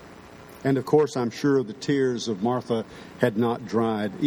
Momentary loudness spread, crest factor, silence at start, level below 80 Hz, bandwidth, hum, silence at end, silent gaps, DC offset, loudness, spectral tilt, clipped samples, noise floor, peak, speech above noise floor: 8 LU; 20 dB; 0 s; -62 dBFS; 19.5 kHz; none; 0 s; none; under 0.1%; -25 LUFS; -6.5 dB/octave; under 0.1%; -45 dBFS; -6 dBFS; 21 dB